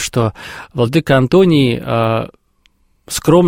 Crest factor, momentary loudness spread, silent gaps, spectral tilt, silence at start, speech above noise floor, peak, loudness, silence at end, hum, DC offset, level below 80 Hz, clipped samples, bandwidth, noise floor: 14 dB; 14 LU; none; -6 dB/octave; 0 s; 43 dB; 0 dBFS; -14 LUFS; 0 s; none; under 0.1%; -42 dBFS; under 0.1%; 16.5 kHz; -56 dBFS